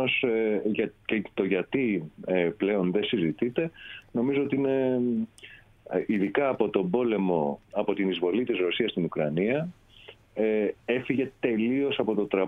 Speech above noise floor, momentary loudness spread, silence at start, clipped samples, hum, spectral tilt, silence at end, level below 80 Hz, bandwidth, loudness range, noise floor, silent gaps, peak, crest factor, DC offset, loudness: 25 dB; 5 LU; 0 s; under 0.1%; none; -8 dB/octave; 0 s; -64 dBFS; 9.2 kHz; 1 LU; -52 dBFS; none; -10 dBFS; 18 dB; under 0.1%; -27 LUFS